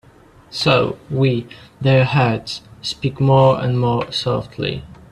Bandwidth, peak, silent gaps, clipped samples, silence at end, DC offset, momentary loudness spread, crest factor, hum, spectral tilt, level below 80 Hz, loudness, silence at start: 11 kHz; 0 dBFS; none; under 0.1%; 0.2 s; under 0.1%; 13 LU; 18 dB; none; -6.5 dB/octave; -48 dBFS; -18 LUFS; 0.5 s